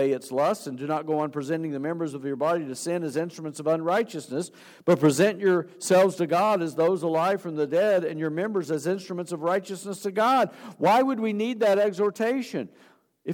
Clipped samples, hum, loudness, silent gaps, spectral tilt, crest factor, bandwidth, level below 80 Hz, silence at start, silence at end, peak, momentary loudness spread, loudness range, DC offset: under 0.1%; none; -25 LUFS; none; -5.5 dB/octave; 18 dB; 18.5 kHz; -80 dBFS; 0 s; 0 s; -8 dBFS; 10 LU; 5 LU; under 0.1%